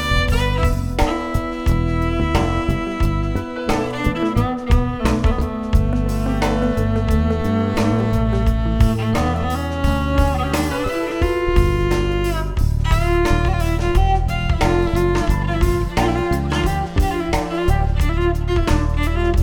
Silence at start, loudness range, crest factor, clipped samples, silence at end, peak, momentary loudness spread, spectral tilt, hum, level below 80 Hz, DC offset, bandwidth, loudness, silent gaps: 0 s; 2 LU; 16 dB; under 0.1%; 0 s; 0 dBFS; 3 LU; -6.5 dB/octave; none; -22 dBFS; under 0.1%; 18 kHz; -19 LUFS; none